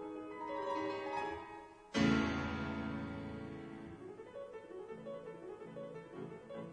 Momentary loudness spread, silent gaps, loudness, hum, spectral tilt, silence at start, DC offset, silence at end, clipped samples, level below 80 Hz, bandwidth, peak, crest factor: 15 LU; none; -42 LUFS; none; -6 dB/octave; 0 s; under 0.1%; 0 s; under 0.1%; -62 dBFS; 10 kHz; -20 dBFS; 20 dB